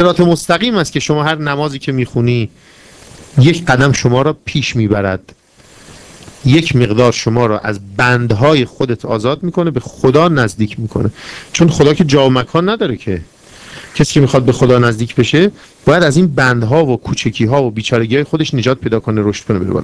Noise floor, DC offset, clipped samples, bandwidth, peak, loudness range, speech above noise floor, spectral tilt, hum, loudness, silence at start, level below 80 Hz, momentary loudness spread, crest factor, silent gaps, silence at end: -42 dBFS; under 0.1%; 0.8%; 11 kHz; 0 dBFS; 3 LU; 30 dB; -6 dB/octave; none; -13 LUFS; 0 s; -38 dBFS; 8 LU; 12 dB; none; 0 s